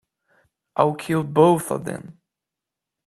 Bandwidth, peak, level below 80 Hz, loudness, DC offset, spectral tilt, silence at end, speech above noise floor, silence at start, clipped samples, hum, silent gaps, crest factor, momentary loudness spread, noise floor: 14.5 kHz; -2 dBFS; -62 dBFS; -21 LUFS; under 0.1%; -6.5 dB/octave; 0.95 s; 66 dB; 0.75 s; under 0.1%; none; none; 22 dB; 15 LU; -86 dBFS